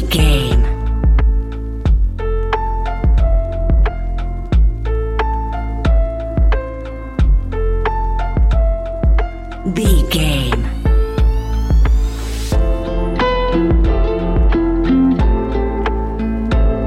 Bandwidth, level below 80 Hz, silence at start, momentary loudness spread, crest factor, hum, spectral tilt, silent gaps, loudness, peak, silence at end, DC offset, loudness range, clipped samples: 13 kHz; -16 dBFS; 0 s; 7 LU; 14 dB; none; -6.5 dB/octave; none; -17 LUFS; 0 dBFS; 0 s; under 0.1%; 3 LU; under 0.1%